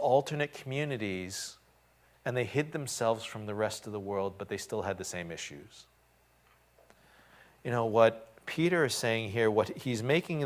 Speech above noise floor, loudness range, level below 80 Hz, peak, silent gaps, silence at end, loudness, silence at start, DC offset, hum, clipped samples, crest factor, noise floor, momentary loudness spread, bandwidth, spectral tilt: 35 dB; 10 LU; -64 dBFS; -10 dBFS; none; 0 s; -32 LUFS; 0 s; under 0.1%; none; under 0.1%; 22 dB; -66 dBFS; 12 LU; 16 kHz; -5 dB/octave